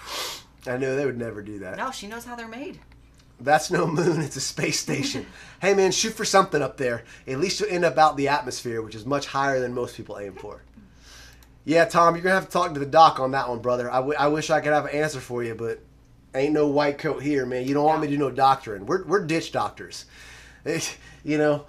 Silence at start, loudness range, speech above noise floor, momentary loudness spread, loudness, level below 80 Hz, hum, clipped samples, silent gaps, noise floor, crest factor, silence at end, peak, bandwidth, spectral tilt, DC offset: 0 s; 6 LU; 25 dB; 16 LU; -23 LUFS; -54 dBFS; none; under 0.1%; none; -48 dBFS; 22 dB; 0.05 s; -2 dBFS; 15 kHz; -4.5 dB/octave; under 0.1%